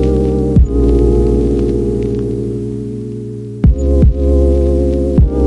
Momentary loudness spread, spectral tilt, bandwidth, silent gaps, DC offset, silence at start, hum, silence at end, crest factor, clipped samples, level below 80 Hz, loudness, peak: 11 LU; -10 dB/octave; 7.4 kHz; none; under 0.1%; 0 s; none; 0 s; 12 dB; under 0.1%; -16 dBFS; -14 LUFS; 0 dBFS